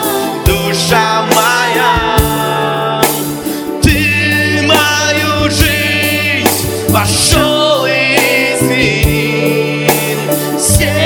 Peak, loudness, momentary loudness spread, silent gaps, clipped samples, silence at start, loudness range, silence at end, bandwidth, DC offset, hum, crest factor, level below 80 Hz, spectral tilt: 0 dBFS; -11 LUFS; 5 LU; none; 0.4%; 0 s; 1 LU; 0 s; over 20 kHz; under 0.1%; none; 12 dB; -24 dBFS; -3.5 dB/octave